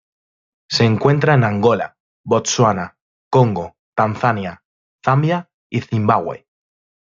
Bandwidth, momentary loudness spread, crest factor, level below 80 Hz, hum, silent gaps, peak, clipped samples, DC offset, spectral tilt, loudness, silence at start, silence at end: 7.6 kHz; 13 LU; 18 dB; -58 dBFS; none; 2.00-2.24 s, 3.01-3.31 s, 3.79-3.93 s, 4.65-4.99 s, 5.54-5.70 s; -2 dBFS; under 0.1%; under 0.1%; -5.5 dB/octave; -17 LUFS; 0.7 s; 0.7 s